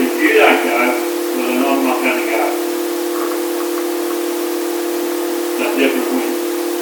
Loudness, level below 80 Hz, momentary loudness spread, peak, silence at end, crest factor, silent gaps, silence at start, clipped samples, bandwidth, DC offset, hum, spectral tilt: -16 LUFS; -72 dBFS; 8 LU; 0 dBFS; 0 s; 16 dB; none; 0 s; under 0.1%; 19.5 kHz; under 0.1%; none; -1 dB/octave